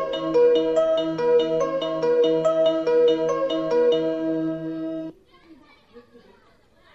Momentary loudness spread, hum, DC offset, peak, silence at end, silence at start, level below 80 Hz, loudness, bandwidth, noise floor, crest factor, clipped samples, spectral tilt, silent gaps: 11 LU; none; under 0.1%; -10 dBFS; 0.95 s; 0 s; -60 dBFS; -21 LUFS; 7.8 kHz; -58 dBFS; 12 dB; under 0.1%; -6 dB/octave; none